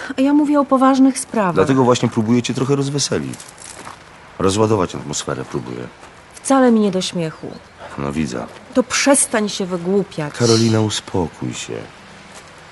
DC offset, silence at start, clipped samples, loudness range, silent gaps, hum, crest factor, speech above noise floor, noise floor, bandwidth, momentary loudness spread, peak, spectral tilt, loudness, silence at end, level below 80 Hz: under 0.1%; 0 s; under 0.1%; 5 LU; none; none; 16 dB; 23 dB; -39 dBFS; 11.5 kHz; 20 LU; -2 dBFS; -4.5 dB/octave; -17 LUFS; 0 s; -50 dBFS